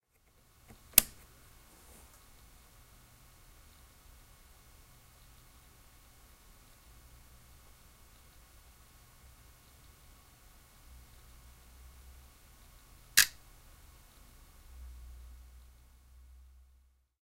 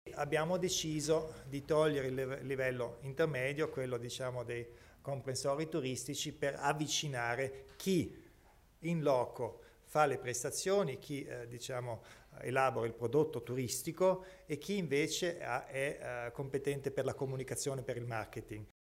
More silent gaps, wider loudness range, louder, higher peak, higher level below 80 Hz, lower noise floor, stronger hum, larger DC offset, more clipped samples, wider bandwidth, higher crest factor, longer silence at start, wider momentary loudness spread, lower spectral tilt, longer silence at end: neither; first, 25 LU vs 3 LU; first, -27 LUFS vs -37 LUFS; first, 0 dBFS vs -16 dBFS; first, -58 dBFS vs -66 dBFS; about the same, -67 dBFS vs -64 dBFS; neither; neither; neither; about the same, 16 kHz vs 16 kHz; first, 42 dB vs 22 dB; first, 0.95 s vs 0.05 s; first, 33 LU vs 11 LU; second, 0.5 dB/octave vs -4.5 dB/octave; first, 1.95 s vs 0.2 s